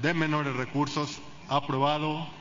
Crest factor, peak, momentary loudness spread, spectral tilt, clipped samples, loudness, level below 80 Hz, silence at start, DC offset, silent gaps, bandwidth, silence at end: 18 dB; -10 dBFS; 6 LU; -5.5 dB/octave; under 0.1%; -29 LUFS; -62 dBFS; 0 s; under 0.1%; none; 7.6 kHz; 0 s